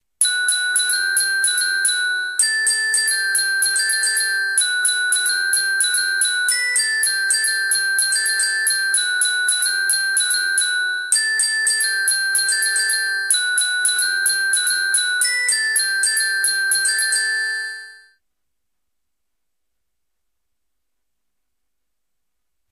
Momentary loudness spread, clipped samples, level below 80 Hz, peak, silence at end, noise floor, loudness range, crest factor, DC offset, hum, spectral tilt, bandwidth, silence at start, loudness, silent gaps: 1 LU; under 0.1%; -72 dBFS; -2 dBFS; 4.75 s; -81 dBFS; 3 LU; 18 dB; under 0.1%; none; 6.5 dB/octave; 15.5 kHz; 0.2 s; -16 LUFS; none